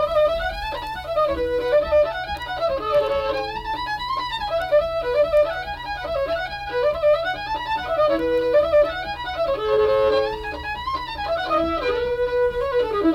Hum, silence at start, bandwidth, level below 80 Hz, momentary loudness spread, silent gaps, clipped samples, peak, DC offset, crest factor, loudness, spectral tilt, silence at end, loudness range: none; 0 s; 15 kHz; -40 dBFS; 8 LU; none; under 0.1%; -8 dBFS; under 0.1%; 12 dB; -22 LUFS; -5.5 dB/octave; 0 s; 2 LU